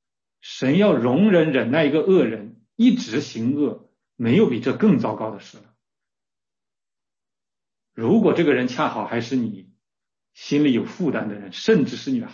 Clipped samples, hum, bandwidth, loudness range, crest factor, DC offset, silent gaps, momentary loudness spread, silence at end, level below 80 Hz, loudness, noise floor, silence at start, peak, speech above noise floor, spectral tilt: under 0.1%; none; 7.4 kHz; 7 LU; 16 dB; under 0.1%; none; 13 LU; 0 s; -66 dBFS; -20 LUFS; under -90 dBFS; 0.45 s; -6 dBFS; over 70 dB; -7 dB/octave